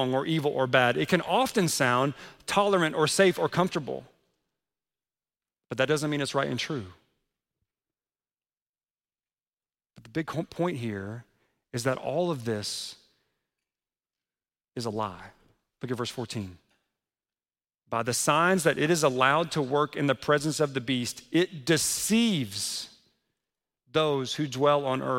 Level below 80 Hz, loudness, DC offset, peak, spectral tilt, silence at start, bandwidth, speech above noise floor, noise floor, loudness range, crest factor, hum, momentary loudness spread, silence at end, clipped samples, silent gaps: -66 dBFS; -27 LUFS; under 0.1%; -8 dBFS; -4 dB/octave; 0 s; 16.5 kHz; over 63 dB; under -90 dBFS; 12 LU; 22 dB; none; 13 LU; 0 s; under 0.1%; 8.62-8.74 s